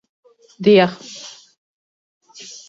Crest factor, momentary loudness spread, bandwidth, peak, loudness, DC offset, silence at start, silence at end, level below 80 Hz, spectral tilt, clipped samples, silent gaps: 20 dB; 24 LU; 7.8 kHz; 0 dBFS; -15 LUFS; under 0.1%; 0.6 s; 1.4 s; -64 dBFS; -5.5 dB/octave; under 0.1%; none